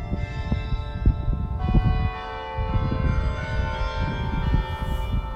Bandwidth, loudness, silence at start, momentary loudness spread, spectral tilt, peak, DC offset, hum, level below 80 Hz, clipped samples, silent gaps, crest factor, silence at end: 7.8 kHz; -26 LUFS; 0 s; 6 LU; -8 dB/octave; -6 dBFS; under 0.1%; none; -26 dBFS; under 0.1%; none; 16 dB; 0 s